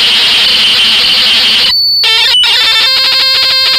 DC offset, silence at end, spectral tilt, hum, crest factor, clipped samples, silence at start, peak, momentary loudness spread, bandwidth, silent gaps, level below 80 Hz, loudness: under 0.1%; 0 s; 0.5 dB/octave; none; 8 dB; under 0.1%; 0 s; 0 dBFS; 1 LU; 16 kHz; none; -42 dBFS; -4 LUFS